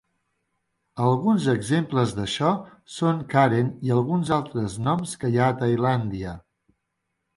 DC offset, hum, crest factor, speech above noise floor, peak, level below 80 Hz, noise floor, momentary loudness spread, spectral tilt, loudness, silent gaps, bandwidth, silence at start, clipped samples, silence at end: under 0.1%; none; 18 dB; 55 dB; -6 dBFS; -54 dBFS; -78 dBFS; 10 LU; -6.5 dB/octave; -23 LUFS; none; 11.5 kHz; 0.95 s; under 0.1%; 0.95 s